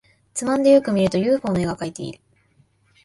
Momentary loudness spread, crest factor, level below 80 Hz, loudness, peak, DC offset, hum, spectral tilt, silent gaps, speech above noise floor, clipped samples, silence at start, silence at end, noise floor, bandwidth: 16 LU; 18 dB; -52 dBFS; -20 LUFS; -4 dBFS; under 0.1%; none; -6 dB/octave; none; 41 dB; under 0.1%; 0.35 s; 0.9 s; -60 dBFS; 11.5 kHz